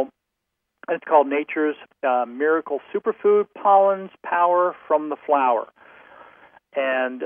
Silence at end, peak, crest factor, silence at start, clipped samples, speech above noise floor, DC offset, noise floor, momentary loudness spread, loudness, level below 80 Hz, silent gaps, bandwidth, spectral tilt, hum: 0 s; -4 dBFS; 18 dB; 0 s; under 0.1%; 59 dB; under 0.1%; -79 dBFS; 11 LU; -21 LUFS; -82 dBFS; none; 3.6 kHz; -8.5 dB/octave; none